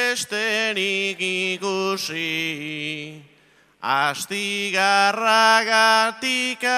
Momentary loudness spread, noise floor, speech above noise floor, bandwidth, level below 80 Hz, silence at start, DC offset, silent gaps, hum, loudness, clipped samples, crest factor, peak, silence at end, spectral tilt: 12 LU; -57 dBFS; 35 dB; 16 kHz; -74 dBFS; 0 s; under 0.1%; none; none; -20 LUFS; under 0.1%; 18 dB; -4 dBFS; 0 s; -2 dB/octave